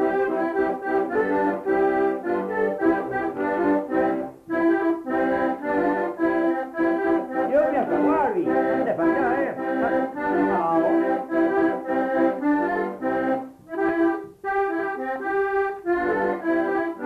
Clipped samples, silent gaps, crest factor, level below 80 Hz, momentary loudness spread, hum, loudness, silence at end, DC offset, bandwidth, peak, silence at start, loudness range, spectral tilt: under 0.1%; none; 14 dB; -56 dBFS; 5 LU; none; -23 LUFS; 0 s; under 0.1%; 4.9 kHz; -10 dBFS; 0 s; 2 LU; -8 dB/octave